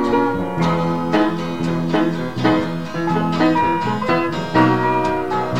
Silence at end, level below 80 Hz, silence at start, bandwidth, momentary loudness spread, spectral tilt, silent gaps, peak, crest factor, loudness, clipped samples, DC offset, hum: 0 s; -46 dBFS; 0 s; 14.5 kHz; 5 LU; -7 dB/octave; none; -2 dBFS; 16 dB; -18 LUFS; under 0.1%; 2%; none